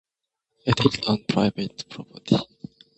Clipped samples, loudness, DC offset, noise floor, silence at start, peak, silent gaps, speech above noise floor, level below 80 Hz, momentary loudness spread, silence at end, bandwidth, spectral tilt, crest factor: under 0.1%; -24 LUFS; under 0.1%; -83 dBFS; 0.65 s; -2 dBFS; none; 60 dB; -52 dBFS; 17 LU; 0.55 s; 8.4 kHz; -6 dB/octave; 24 dB